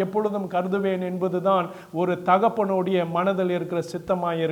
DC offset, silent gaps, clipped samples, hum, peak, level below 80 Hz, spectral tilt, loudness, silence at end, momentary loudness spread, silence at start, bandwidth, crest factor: under 0.1%; none; under 0.1%; none; -6 dBFS; -64 dBFS; -7.5 dB/octave; -24 LUFS; 0 s; 7 LU; 0 s; 17 kHz; 18 dB